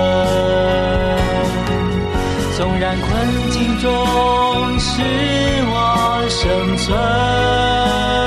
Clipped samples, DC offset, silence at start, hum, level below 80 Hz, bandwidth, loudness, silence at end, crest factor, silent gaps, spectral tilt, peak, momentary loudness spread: under 0.1%; under 0.1%; 0 s; none; -26 dBFS; 14 kHz; -16 LUFS; 0 s; 12 dB; none; -5 dB/octave; -4 dBFS; 4 LU